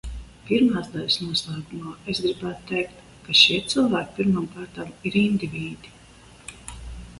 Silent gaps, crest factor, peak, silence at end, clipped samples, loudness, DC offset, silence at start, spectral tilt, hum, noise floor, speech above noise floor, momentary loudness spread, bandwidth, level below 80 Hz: none; 24 dB; 0 dBFS; 0 s; under 0.1%; -22 LUFS; under 0.1%; 0.05 s; -4.5 dB/octave; none; -49 dBFS; 25 dB; 23 LU; 11.5 kHz; -46 dBFS